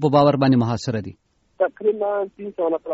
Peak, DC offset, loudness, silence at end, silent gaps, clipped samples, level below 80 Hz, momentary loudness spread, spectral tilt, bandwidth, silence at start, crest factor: -4 dBFS; under 0.1%; -21 LUFS; 0 s; none; under 0.1%; -56 dBFS; 13 LU; -6.5 dB/octave; 8 kHz; 0 s; 16 dB